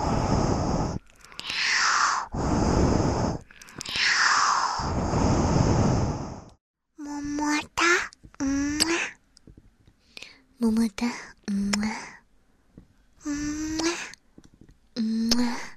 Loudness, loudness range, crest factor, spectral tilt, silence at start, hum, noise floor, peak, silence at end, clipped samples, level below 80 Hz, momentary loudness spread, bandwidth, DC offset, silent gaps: -25 LUFS; 7 LU; 20 dB; -4 dB/octave; 0 s; none; -61 dBFS; -6 dBFS; 0 s; under 0.1%; -40 dBFS; 17 LU; 13.5 kHz; under 0.1%; 6.61-6.74 s